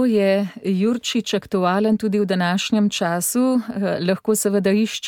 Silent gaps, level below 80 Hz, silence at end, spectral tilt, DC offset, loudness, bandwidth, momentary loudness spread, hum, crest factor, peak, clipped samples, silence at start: none; -62 dBFS; 0 s; -5 dB/octave; under 0.1%; -20 LUFS; 17.5 kHz; 4 LU; none; 14 dB; -6 dBFS; under 0.1%; 0 s